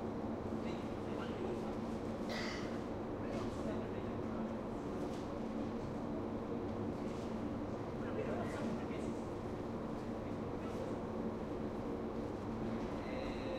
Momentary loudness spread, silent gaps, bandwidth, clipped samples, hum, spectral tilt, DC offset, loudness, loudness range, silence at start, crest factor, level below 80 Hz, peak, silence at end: 2 LU; none; 13 kHz; under 0.1%; none; -7 dB/octave; under 0.1%; -42 LUFS; 1 LU; 0 s; 14 dB; -56 dBFS; -28 dBFS; 0 s